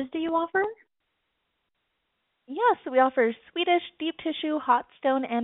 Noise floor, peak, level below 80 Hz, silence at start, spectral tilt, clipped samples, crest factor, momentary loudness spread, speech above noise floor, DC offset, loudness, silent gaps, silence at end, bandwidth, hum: -78 dBFS; -8 dBFS; -72 dBFS; 0 s; -0.5 dB/octave; under 0.1%; 20 dB; 8 LU; 52 dB; under 0.1%; -26 LUFS; none; 0 s; 4 kHz; none